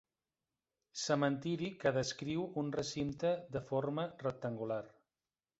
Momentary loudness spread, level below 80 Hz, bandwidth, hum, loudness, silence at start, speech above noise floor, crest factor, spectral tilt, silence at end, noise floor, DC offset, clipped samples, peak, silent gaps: 7 LU; -70 dBFS; 8 kHz; none; -38 LUFS; 0.95 s; over 53 dB; 20 dB; -5 dB/octave; 0.7 s; under -90 dBFS; under 0.1%; under 0.1%; -18 dBFS; none